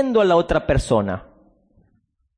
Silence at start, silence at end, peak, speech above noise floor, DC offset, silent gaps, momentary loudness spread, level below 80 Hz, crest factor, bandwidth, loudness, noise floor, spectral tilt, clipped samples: 0 s; 1.15 s; -6 dBFS; 48 dB; under 0.1%; none; 11 LU; -34 dBFS; 16 dB; 10.5 kHz; -19 LUFS; -66 dBFS; -6.5 dB/octave; under 0.1%